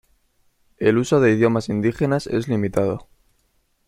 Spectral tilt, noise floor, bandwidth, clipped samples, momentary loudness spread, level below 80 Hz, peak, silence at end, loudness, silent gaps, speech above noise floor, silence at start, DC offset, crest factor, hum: -7 dB/octave; -65 dBFS; 14 kHz; under 0.1%; 6 LU; -50 dBFS; -2 dBFS; 0.85 s; -20 LUFS; none; 46 dB; 0.8 s; under 0.1%; 18 dB; none